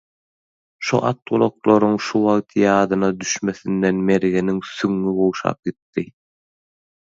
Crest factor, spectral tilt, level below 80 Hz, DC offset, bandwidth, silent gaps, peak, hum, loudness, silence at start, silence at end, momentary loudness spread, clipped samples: 18 dB; -5.5 dB/octave; -56 dBFS; under 0.1%; 7.8 kHz; 5.82-5.93 s; -2 dBFS; none; -19 LUFS; 0.8 s; 1.05 s; 11 LU; under 0.1%